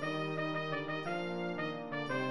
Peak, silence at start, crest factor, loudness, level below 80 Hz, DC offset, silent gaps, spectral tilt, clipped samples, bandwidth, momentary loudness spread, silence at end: -24 dBFS; 0 s; 14 dB; -37 LUFS; -74 dBFS; 0.2%; none; -6.5 dB/octave; under 0.1%; 11 kHz; 2 LU; 0 s